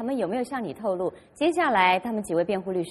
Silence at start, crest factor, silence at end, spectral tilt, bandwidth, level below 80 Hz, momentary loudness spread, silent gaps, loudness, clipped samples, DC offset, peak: 0 s; 18 dB; 0 s; -5 dB/octave; 13 kHz; -62 dBFS; 9 LU; none; -25 LUFS; under 0.1%; under 0.1%; -6 dBFS